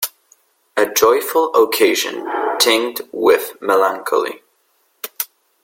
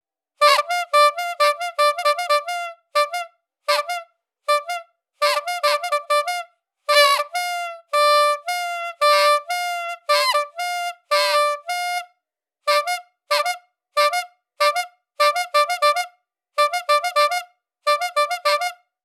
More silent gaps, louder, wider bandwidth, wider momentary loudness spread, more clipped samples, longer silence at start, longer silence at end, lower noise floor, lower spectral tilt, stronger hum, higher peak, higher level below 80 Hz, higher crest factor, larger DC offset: neither; first, -16 LUFS vs -20 LUFS; about the same, 17 kHz vs 18.5 kHz; about the same, 12 LU vs 13 LU; neither; second, 0 s vs 0.4 s; about the same, 0.4 s vs 0.3 s; second, -62 dBFS vs -79 dBFS; first, -1 dB/octave vs 6 dB/octave; neither; about the same, 0 dBFS vs -2 dBFS; first, -64 dBFS vs under -90 dBFS; about the same, 18 dB vs 20 dB; neither